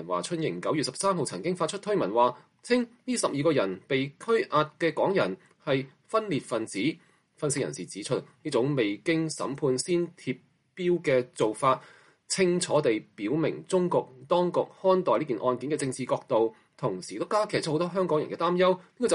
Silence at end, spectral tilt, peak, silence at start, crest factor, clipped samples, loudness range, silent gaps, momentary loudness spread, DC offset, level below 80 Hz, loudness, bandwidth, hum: 0 s; -5 dB/octave; -10 dBFS; 0 s; 18 dB; under 0.1%; 3 LU; none; 7 LU; under 0.1%; -72 dBFS; -28 LUFS; 11.5 kHz; none